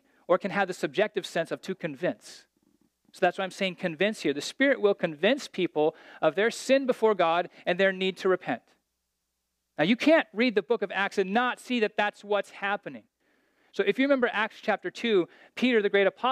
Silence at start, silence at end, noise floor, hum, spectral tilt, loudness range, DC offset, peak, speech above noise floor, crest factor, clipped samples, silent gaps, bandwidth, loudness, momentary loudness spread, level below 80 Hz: 0.3 s; 0 s; -80 dBFS; none; -4.5 dB/octave; 5 LU; under 0.1%; -10 dBFS; 54 dB; 18 dB; under 0.1%; none; 14.5 kHz; -27 LUFS; 8 LU; -82 dBFS